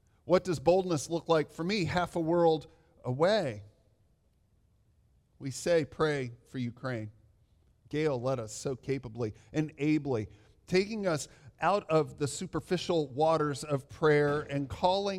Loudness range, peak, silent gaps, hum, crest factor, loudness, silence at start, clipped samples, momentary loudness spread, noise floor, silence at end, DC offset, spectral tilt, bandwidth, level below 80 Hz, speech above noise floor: 6 LU; -12 dBFS; none; none; 20 dB; -31 LUFS; 0.25 s; under 0.1%; 11 LU; -69 dBFS; 0 s; under 0.1%; -5.5 dB/octave; 14.5 kHz; -60 dBFS; 39 dB